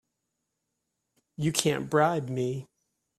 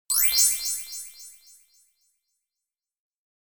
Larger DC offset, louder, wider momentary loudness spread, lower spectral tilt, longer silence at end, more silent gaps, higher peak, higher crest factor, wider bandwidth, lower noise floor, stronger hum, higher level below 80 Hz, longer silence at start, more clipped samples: neither; second, -28 LUFS vs -20 LUFS; second, 8 LU vs 23 LU; first, -4.5 dB/octave vs 4.5 dB/octave; second, 0.55 s vs 2.2 s; neither; about the same, -6 dBFS vs -6 dBFS; about the same, 26 dB vs 24 dB; second, 15 kHz vs over 20 kHz; second, -82 dBFS vs -88 dBFS; neither; about the same, -66 dBFS vs -64 dBFS; first, 1.4 s vs 0.1 s; neither